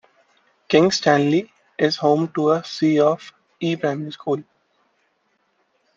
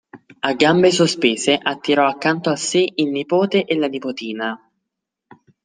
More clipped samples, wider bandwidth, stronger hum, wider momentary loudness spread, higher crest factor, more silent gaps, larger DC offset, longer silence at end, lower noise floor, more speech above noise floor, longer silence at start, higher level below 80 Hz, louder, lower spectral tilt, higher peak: neither; second, 7.6 kHz vs 10 kHz; neither; about the same, 11 LU vs 11 LU; about the same, 20 dB vs 18 dB; neither; neither; first, 1.55 s vs 1.1 s; second, -67 dBFS vs -80 dBFS; second, 49 dB vs 63 dB; first, 0.7 s vs 0.15 s; about the same, -66 dBFS vs -64 dBFS; about the same, -20 LUFS vs -18 LUFS; first, -5.5 dB/octave vs -4 dB/octave; about the same, -2 dBFS vs -2 dBFS